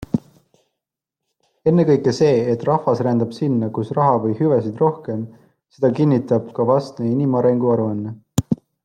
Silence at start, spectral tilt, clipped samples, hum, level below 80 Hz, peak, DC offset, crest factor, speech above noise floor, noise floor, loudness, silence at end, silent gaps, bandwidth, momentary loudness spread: 0.15 s; -8 dB/octave; under 0.1%; none; -54 dBFS; -4 dBFS; under 0.1%; 16 dB; 65 dB; -83 dBFS; -19 LUFS; 0.3 s; none; 16 kHz; 9 LU